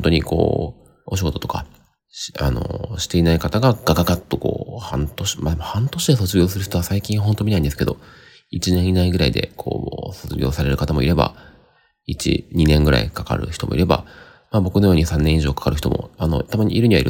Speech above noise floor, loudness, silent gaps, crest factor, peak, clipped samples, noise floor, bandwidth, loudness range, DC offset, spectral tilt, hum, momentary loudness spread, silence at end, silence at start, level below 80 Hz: 38 dB; -20 LUFS; none; 18 dB; -2 dBFS; under 0.1%; -56 dBFS; 17 kHz; 3 LU; under 0.1%; -6 dB/octave; none; 10 LU; 0 s; 0 s; -32 dBFS